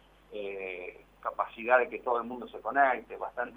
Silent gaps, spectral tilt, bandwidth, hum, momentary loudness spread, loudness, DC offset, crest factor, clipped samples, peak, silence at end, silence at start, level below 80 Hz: none; -6 dB/octave; 19.5 kHz; 50 Hz at -65 dBFS; 15 LU; -31 LUFS; under 0.1%; 22 dB; under 0.1%; -10 dBFS; 0 s; 0.3 s; -66 dBFS